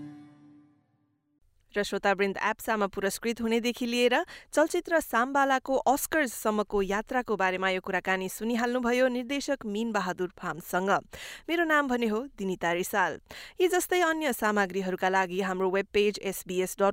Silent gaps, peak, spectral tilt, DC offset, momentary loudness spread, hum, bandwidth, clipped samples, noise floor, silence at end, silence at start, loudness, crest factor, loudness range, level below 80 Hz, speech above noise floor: none; -12 dBFS; -4 dB/octave; under 0.1%; 7 LU; none; 16 kHz; under 0.1%; -72 dBFS; 0 s; 0 s; -28 LUFS; 16 dB; 3 LU; -58 dBFS; 44 dB